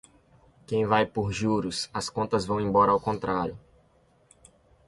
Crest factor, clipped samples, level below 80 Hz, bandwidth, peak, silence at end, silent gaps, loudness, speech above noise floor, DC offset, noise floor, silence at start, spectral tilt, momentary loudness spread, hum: 20 dB; under 0.1%; -54 dBFS; 11.5 kHz; -8 dBFS; 1.3 s; none; -26 LUFS; 37 dB; under 0.1%; -63 dBFS; 0.7 s; -5.5 dB/octave; 9 LU; none